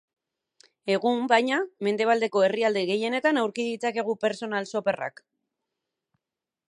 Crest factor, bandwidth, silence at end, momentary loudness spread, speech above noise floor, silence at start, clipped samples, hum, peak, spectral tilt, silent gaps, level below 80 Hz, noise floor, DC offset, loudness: 20 dB; 11 kHz; 1.6 s; 7 LU; 64 dB; 0.85 s; under 0.1%; none; -6 dBFS; -4.5 dB/octave; none; -80 dBFS; -89 dBFS; under 0.1%; -25 LUFS